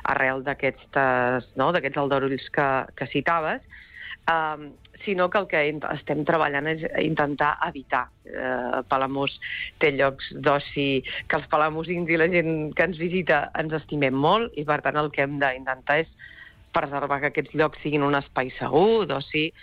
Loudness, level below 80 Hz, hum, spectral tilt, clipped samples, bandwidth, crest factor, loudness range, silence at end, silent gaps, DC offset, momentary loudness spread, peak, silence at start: -24 LUFS; -54 dBFS; none; -8 dB/octave; under 0.1%; 6.8 kHz; 16 dB; 2 LU; 0 s; none; under 0.1%; 8 LU; -10 dBFS; 0 s